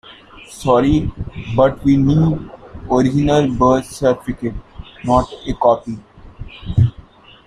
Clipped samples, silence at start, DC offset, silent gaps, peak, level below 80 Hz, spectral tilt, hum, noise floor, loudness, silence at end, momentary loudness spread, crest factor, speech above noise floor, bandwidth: under 0.1%; 0.1 s; under 0.1%; none; -2 dBFS; -34 dBFS; -7.5 dB/octave; none; -42 dBFS; -16 LUFS; 0.55 s; 18 LU; 16 dB; 27 dB; 13 kHz